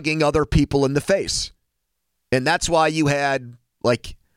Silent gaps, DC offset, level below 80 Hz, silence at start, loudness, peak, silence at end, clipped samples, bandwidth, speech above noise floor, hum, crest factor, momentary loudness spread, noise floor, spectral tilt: none; under 0.1%; -38 dBFS; 0 s; -20 LUFS; -6 dBFS; 0.2 s; under 0.1%; 16 kHz; 57 dB; none; 16 dB; 7 LU; -77 dBFS; -4.5 dB/octave